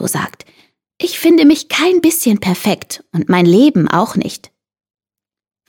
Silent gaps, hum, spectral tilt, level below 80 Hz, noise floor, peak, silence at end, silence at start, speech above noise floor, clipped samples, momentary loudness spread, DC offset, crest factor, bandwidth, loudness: none; none; -5 dB/octave; -56 dBFS; -87 dBFS; 0 dBFS; 1.3 s; 0 s; 75 dB; under 0.1%; 13 LU; under 0.1%; 14 dB; 17.5 kHz; -13 LUFS